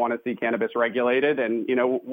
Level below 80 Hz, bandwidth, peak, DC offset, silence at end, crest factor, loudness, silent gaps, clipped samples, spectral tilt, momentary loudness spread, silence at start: -74 dBFS; 16 kHz; -8 dBFS; under 0.1%; 0 s; 14 dB; -24 LUFS; none; under 0.1%; -8 dB/octave; 5 LU; 0 s